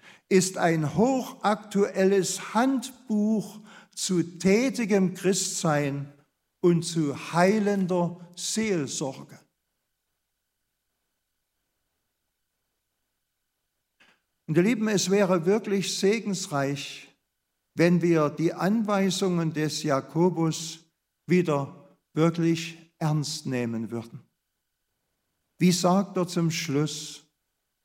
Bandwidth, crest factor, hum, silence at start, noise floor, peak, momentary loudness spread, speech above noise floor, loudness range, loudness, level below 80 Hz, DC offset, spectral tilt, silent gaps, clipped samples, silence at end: 16 kHz; 20 dB; none; 0.05 s; -80 dBFS; -6 dBFS; 12 LU; 55 dB; 6 LU; -26 LUFS; -70 dBFS; under 0.1%; -5 dB/octave; none; under 0.1%; 0.65 s